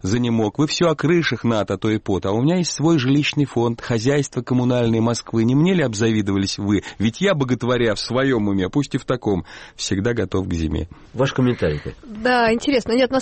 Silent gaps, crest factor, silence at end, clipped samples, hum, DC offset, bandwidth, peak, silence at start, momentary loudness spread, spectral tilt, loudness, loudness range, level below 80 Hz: none; 12 dB; 0 s; under 0.1%; none; under 0.1%; 8.8 kHz; -6 dBFS; 0.05 s; 6 LU; -5.5 dB/octave; -20 LUFS; 3 LU; -42 dBFS